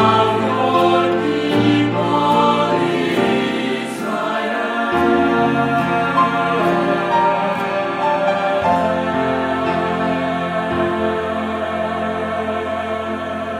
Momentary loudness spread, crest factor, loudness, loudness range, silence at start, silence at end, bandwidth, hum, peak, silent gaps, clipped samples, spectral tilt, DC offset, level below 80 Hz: 7 LU; 16 dB; -17 LUFS; 4 LU; 0 s; 0 s; 15.5 kHz; none; -2 dBFS; none; under 0.1%; -6 dB/octave; under 0.1%; -50 dBFS